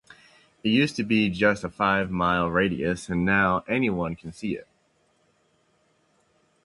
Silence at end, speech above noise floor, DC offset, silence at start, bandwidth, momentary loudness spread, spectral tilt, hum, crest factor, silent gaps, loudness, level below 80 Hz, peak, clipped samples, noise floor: 2 s; 43 dB; under 0.1%; 0.65 s; 11.5 kHz; 11 LU; -6 dB/octave; none; 20 dB; none; -24 LUFS; -50 dBFS; -6 dBFS; under 0.1%; -67 dBFS